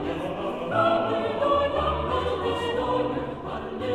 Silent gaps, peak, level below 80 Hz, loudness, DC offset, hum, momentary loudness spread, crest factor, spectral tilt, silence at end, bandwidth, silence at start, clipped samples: none; -10 dBFS; -44 dBFS; -26 LUFS; 0.1%; none; 9 LU; 16 dB; -6.5 dB/octave; 0 s; 12.5 kHz; 0 s; under 0.1%